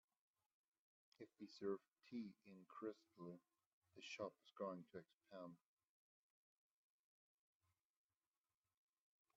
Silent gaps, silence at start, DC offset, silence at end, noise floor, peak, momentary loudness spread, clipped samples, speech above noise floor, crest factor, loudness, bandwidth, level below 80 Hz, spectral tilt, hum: 3.66-3.82 s, 5.14-5.18 s; 1.2 s; under 0.1%; 3.8 s; under -90 dBFS; -36 dBFS; 13 LU; under 0.1%; over 35 dB; 22 dB; -56 LUFS; 7.2 kHz; under -90 dBFS; -4.5 dB/octave; none